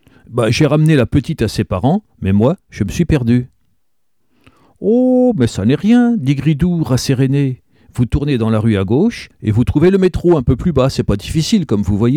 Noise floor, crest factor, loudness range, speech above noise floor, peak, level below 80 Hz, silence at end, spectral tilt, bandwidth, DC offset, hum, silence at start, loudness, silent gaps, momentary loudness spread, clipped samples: -71 dBFS; 12 dB; 3 LU; 58 dB; -2 dBFS; -32 dBFS; 0 s; -7 dB/octave; 14.5 kHz; 0.1%; none; 0.3 s; -14 LUFS; none; 7 LU; under 0.1%